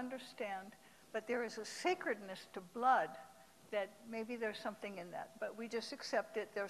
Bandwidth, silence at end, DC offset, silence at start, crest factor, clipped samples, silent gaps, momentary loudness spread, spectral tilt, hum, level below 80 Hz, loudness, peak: 14 kHz; 0 s; under 0.1%; 0 s; 22 dB; under 0.1%; none; 13 LU; -3.5 dB/octave; none; -84 dBFS; -42 LUFS; -20 dBFS